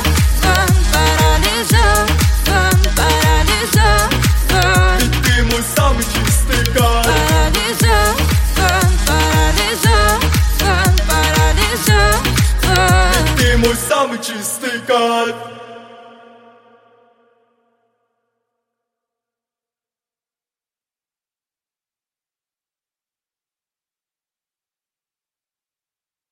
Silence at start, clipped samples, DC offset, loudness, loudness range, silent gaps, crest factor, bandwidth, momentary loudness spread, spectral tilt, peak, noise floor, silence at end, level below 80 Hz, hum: 0 s; under 0.1%; under 0.1%; -13 LUFS; 6 LU; none; 14 dB; 17 kHz; 4 LU; -4 dB/octave; 0 dBFS; under -90 dBFS; 10.5 s; -20 dBFS; none